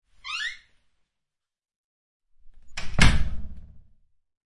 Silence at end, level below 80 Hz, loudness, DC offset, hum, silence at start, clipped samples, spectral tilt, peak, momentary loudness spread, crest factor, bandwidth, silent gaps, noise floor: 0.7 s; -32 dBFS; -26 LUFS; under 0.1%; none; 0.25 s; under 0.1%; -4 dB/octave; -2 dBFS; 22 LU; 24 dB; 11.5 kHz; 1.76-2.20 s; -84 dBFS